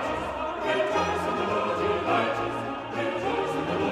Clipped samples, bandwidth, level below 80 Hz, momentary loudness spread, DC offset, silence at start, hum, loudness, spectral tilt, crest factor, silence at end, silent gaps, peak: under 0.1%; 14 kHz; -54 dBFS; 6 LU; under 0.1%; 0 s; none; -27 LUFS; -5.5 dB/octave; 14 dB; 0 s; none; -12 dBFS